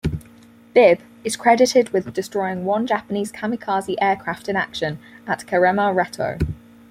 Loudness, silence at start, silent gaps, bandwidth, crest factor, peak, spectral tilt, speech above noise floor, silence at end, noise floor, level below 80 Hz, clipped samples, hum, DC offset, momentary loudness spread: -20 LUFS; 0.05 s; none; 15.5 kHz; 18 dB; -2 dBFS; -5 dB/octave; 28 dB; 0.35 s; -47 dBFS; -44 dBFS; under 0.1%; none; under 0.1%; 12 LU